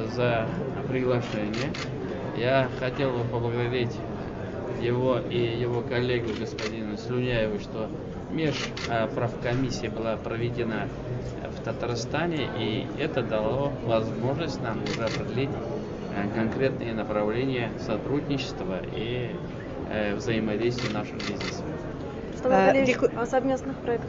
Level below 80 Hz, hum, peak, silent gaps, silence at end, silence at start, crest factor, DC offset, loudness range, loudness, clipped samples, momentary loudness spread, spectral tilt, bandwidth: -46 dBFS; none; -8 dBFS; none; 0 s; 0 s; 20 dB; under 0.1%; 4 LU; -28 LUFS; under 0.1%; 8 LU; -6.5 dB/octave; 7.8 kHz